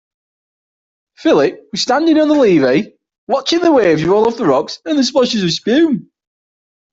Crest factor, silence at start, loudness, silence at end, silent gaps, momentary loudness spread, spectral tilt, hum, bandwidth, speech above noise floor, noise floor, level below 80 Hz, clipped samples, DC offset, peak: 14 dB; 1.2 s; -14 LUFS; 0.9 s; 3.18-3.27 s; 8 LU; -5 dB/octave; none; 7.8 kHz; over 77 dB; under -90 dBFS; -54 dBFS; under 0.1%; under 0.1%; 0 dBFS